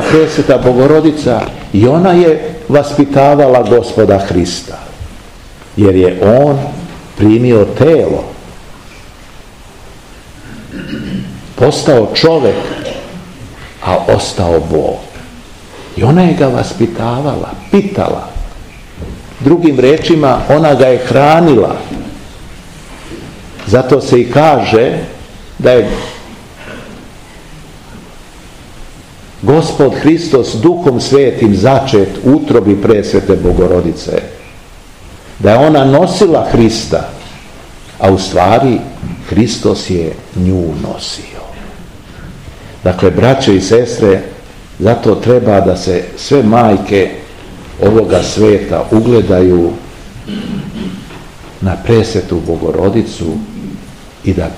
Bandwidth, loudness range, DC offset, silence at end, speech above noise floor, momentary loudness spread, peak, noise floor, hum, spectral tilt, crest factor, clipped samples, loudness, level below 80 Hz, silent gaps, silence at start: 15 kHz; 7 LU; 0.5%; 0 s; 25 dB; 21 LU; 0 dBFS; -34 dBFS; none; -6.5 dB/octave; 10 dB; 2%; -10 LUFS; -32 dBFS; none; 0 s